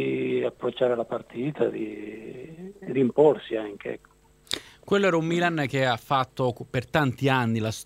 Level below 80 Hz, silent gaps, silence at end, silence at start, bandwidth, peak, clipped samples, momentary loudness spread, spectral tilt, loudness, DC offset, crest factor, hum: -60 dBFS; none; 0 s; 0 s; 16 kHz; -6 dBFS; under 0.1%; 16 LU; -6 dB/octave; -26 LUFS; under 0.1%; 20 dB; none